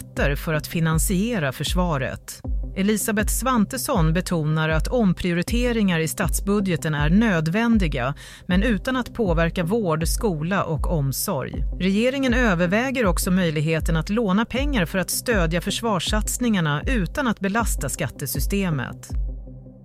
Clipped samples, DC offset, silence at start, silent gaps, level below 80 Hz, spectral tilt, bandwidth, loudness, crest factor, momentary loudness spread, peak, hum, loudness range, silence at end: under 0.1%; under 0.1%; 0 s; none; -30 dBFS; -5 dB/octave; 16 kHz; -22 LUFS; 14 dB; 6 LU; -8 dBFS; none; 2 LU; 0 s